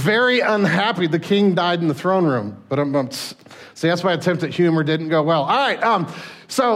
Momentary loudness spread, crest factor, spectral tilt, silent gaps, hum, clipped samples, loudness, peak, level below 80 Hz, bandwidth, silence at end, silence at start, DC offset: 9 LU; 14 dB; -5.5 dB/octave; none; none; under 0.1%; -19 LUFS; -6 dBFS; -66 dBFS; 16 kHz; 0 s; 0 s; under 0.1%